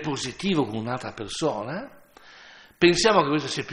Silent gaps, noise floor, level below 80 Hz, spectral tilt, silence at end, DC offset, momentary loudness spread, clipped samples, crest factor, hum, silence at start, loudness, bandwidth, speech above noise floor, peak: none; -50 dBFS; -56 dBFS; -4.5 dB/octave; 0 s; under 0.1%; 14 LU; under 0.1%; 20 dB; none; 0 s; -24 LUFS; 11.5 kHz; 25 dB; -4 dBFS